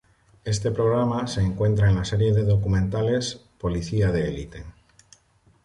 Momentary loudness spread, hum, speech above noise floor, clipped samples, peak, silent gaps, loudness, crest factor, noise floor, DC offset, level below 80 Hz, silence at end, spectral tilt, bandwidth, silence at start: 11 LU; none; 38 dB; under 0.1%; -10 dBFS; none; -23 LUFS; 14 dB; -60 dBFS; under 0.1%; -38 dBFS; 0.95 s; -6.5 dB/octave; 11 kHz; 0.45 s